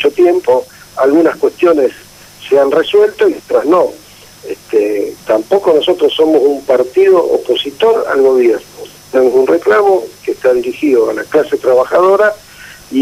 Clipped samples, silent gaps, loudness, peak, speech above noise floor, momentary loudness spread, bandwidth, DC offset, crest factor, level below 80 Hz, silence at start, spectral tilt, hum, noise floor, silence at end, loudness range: under 0.1%; none; -11 LUFS; 0 dBFS; 24 dB; 8 LU; 15.5 kHz; under 0.1%; 12 dB; -54 dBFS; 0 s; -4.5 dB/octave; none; -35 dBFS; 0 s; 2 LU